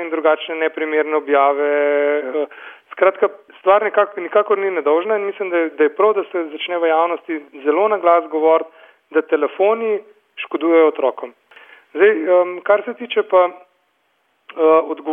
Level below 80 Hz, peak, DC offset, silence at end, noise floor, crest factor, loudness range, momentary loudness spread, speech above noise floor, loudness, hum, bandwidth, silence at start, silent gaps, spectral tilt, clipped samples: -72 dBFS; -2 dBFS; under 0.1%; 0 s; -64 dBFS; 16 dB; 1 LU; 10 LU; 48 dB; -17 LUFS; none; 3.7 kHz; 0 s; none; -7 dB/octave; under 0.1%